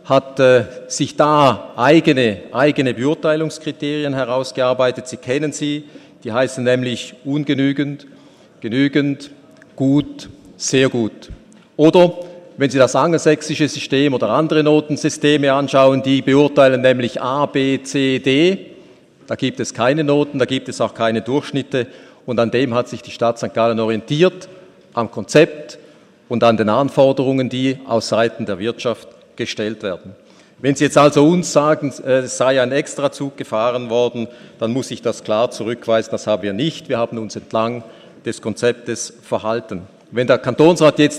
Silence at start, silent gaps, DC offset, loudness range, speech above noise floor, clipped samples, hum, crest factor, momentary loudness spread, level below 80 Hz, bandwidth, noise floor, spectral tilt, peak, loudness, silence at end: 0.05 s; none; under 0.1%; 6 LU; 30 dB; under 0.1%; none; 16 dB; 13 LU; -56 dBFS; 12 kHz; -46 dBFS; -5.5 dB/octave; 0 dBFS; -17 LUFS; 0 s